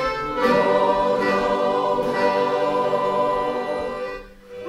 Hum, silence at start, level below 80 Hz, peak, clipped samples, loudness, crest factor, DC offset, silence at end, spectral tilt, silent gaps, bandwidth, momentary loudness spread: none; 0 s; -48 dBFS; -6 dBFS; under 0.1%; -21 LUFS; 16 dB; under 0.1%; 0 s; -5.5 dB/octave; none; 13.5 kHz; 10 LU